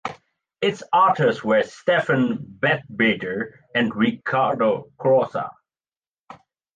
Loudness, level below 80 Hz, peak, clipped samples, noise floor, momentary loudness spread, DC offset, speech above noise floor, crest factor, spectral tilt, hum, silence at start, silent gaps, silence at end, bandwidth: -21 LUFS; -62 dBFS; -4 dBFS; under 0.1%; under -90 dBFS; 9 LU; under 0.1%; over 69 dB; 18 dB; -6.5 dB/octave; none; 0.05 s; 5.98-6.02 s, 6.09-6.13 s, 6.19-6.25 s; 0.4 s; 9 kHz